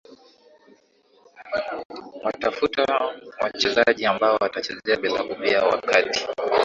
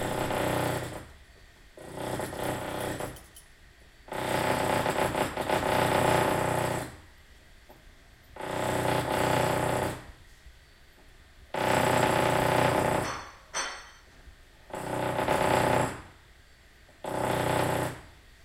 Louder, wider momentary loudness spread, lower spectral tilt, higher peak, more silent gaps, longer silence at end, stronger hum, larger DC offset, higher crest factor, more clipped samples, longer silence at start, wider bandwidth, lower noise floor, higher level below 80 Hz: first, -22 LUFS vs -29 LUFS; second, 11 LU vs 15 LU; second, -3 dB/octave vs -4.5 dB/octave; first, -2 dBFS vs -10 dBFS; first, 1.85-1.90 s vs none; second, 0 s vs 0.35 s; neither; neither; about the same, 22 dB vs 20 dB; neither; first, 1.4 s vs 0 s; second, 7.8 kHz vs 16.5 kHz; about the same, -59 dBFS vs -56 dBFS; second, -60 dBFS vs -52 dBFS